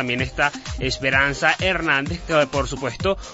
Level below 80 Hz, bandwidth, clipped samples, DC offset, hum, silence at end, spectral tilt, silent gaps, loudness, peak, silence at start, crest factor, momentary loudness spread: -36 dBFS; 8 kHz; under 0.1%; under 0.1%; none; 0 s; -4 dB/octave; none; -21 LUFS; -2 dBFS; 0 s; 18 dB; 6 LU